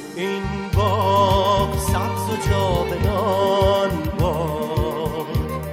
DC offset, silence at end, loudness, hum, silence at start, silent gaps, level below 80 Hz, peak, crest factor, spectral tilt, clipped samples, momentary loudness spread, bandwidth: under 0.1%; 0 s; -20 LUFS; none; 0 s; none; -30 dBFS; -6 dBFS; 14 dB; -6 dB/octave; under 0.1%; 8 LU; 16 kHz